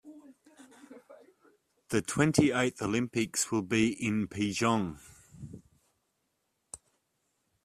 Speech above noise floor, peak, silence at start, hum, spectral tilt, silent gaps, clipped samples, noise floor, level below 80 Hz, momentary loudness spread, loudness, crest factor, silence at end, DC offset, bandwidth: 50 dB; -8 dBFS; 0.05 s; none; -4.5 dB/octave; none; under 0.1%; -79 dBFS; -64 dBFS; 22 LU; -30 LUFS; 26 dB; 0.9 s; under 0.1%; 14 kHz